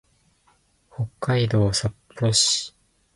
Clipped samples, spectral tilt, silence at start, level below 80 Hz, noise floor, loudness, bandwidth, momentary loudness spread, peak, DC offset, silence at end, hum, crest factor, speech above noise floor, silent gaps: under 0.1%; -4 dB/octave; 1 s; -48 dBFS; -63 dBFS; -22 LUFS; 11.5 kHz; 14 LU; -4 dBFS; under 0.1%; 0.45 s; none; 20 dB; 41 dB; none